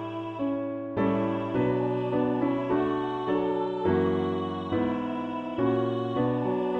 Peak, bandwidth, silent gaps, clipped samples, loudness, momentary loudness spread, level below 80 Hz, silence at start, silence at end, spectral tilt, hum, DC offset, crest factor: -14 dBFS; 6.4 kHz; none; under 0.1%; -28 LUFS; 5 LU; -58 dBFS; 0 s; 0 s; -9 dB/octave; none; under 0.1%; 14 dB